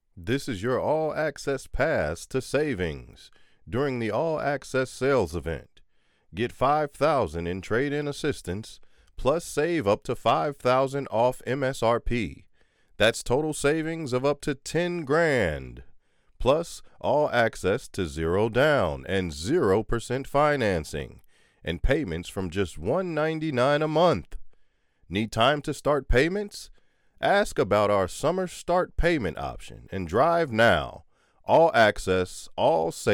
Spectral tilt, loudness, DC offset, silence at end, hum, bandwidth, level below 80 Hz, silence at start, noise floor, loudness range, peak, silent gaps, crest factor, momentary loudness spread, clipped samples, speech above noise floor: -5.5 dB/octave; -26 LUFS; under 0.1%; 0 s; none; 17 kHz; -42 dBFS; 0.15 s; -62 dBFS; 3 LU; -10 dBFS; none; 16 dB; 10 LU; under 0.1%; 37 dB